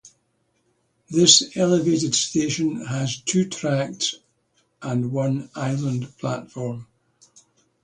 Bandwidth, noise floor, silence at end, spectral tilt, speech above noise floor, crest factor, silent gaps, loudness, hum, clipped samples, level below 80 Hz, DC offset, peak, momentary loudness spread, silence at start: 11 kHz; -69 dBFS; 1 s; -4 dB/octave; 47 dB; 24 dB; none; -21 LUFS; none; under 0.1%; -62 dBFS; under 0.1%; 0 dBFS; 15 LU; 0.05 s